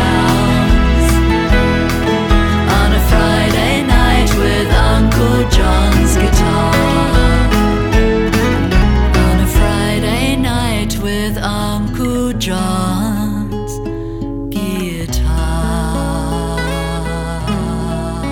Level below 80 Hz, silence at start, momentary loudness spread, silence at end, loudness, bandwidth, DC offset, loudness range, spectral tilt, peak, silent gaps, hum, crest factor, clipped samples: -16 dBFS; 0 s; 7 LU; 0 s; -14 LUFS; 18 kHz; under 0.1%; 6 LU; -5.5 dB/octave; 0 dBFS; none; none; 12 dB; under 0.1%